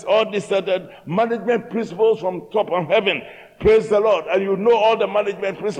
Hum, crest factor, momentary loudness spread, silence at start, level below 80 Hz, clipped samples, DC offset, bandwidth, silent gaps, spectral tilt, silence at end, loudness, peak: none; 16 dB; 8 LU; 0 s; -48 dBFS; under 0.1%; under 0.1%; 9.6 kHz; none; -5.5 dB/octave; 0 s; -19 LUFS; -4 dBFS